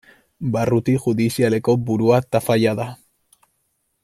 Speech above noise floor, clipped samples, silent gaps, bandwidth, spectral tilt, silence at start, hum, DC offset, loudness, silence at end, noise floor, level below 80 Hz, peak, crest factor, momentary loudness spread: 52 dB; under 0.1%; none; 15.5 kHz; -7 dB/octave; 0.4 s; none; under 0.1%; -19 LUFS; 1.1 s; -70 dBFS; -54 dBFS; -2 dBFS; 18 dB; 8 LU